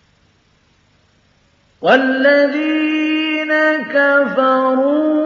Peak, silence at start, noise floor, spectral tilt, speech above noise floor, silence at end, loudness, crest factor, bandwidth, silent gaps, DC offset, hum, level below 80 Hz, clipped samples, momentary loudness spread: 0 dBFS; 1.8 s; -56 dBFS; -5.5 dB/octave; 43 dB; 0 s; -14 LUFS; 16 dB; 7 kHz; none; under 0.1%; none; -68 dBFS; under 0.1%; 4 LU